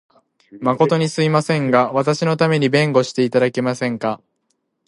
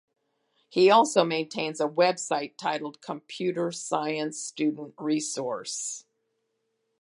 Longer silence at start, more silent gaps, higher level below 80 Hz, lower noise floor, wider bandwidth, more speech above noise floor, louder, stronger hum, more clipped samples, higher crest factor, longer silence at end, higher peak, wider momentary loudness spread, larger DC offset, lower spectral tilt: second, 0.55 s vs 0.7 s; neither; first, -64 dBFS vs -82 dBFS; second, -70 dBFS vs -77 dBFS; about the same, 11.5 kHz vs 11.5 kHz; about the same, 53 dB vs 51 dB; first, -17 LUFS vs -27 LUFS; neither; neither; second, 16 dB vs 22 dB; second, 0.7 s vs 1 s; first, -2 dBFS vs -6 dBFS; second, 6 LU vs 14 LU; neither; first, -6 dB/octave vs -3.5 dB/octave